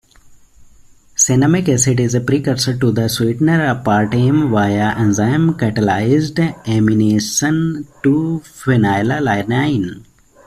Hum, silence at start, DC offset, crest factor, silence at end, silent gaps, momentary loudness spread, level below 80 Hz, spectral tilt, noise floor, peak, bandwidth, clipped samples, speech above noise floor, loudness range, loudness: none; 0.6 s; under 0.1%; 14 dB; 0.45 s; none; 5 LU; -46 dBFS; -5 dB/octave; -45 dBFS; -2 dBFS; 14.5 kHz; under 0.1%; 30 dB; 1 LU; -15 LUFS